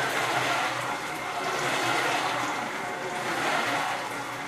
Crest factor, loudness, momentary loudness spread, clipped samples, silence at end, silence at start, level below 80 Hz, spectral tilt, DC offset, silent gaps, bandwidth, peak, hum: 16 dB; -28 LUFS; 6 LU; under 0.1%; 0 s; 0 s; -66 dBFS; -2.5 dB/octave; under 0.1%; none; 15.5 kHz; -14 dBFS; none